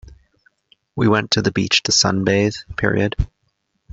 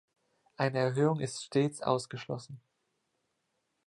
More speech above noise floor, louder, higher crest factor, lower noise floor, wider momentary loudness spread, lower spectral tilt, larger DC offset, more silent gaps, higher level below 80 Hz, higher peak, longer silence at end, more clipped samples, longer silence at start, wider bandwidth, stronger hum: about the same, 51 dB vs 49 dB; first, -18 LUFS vs -32 LUFS; about the same, 18 dB vs 20 dB; second, -69 dBFS vs -80 dBFS; second, 9 LU vs 12 LU; second, -4 dB/octave vs -6 dB/octave; neither; neither; first, -36 dBFS vs -74 dBFS; first, -2 dBFS vs -14 dBFS; second, 0.65 s vs 1.3 s; neither; second, 0.1 s vs 0.6 s; second, 8 kHz vs 11.5 kHz; neither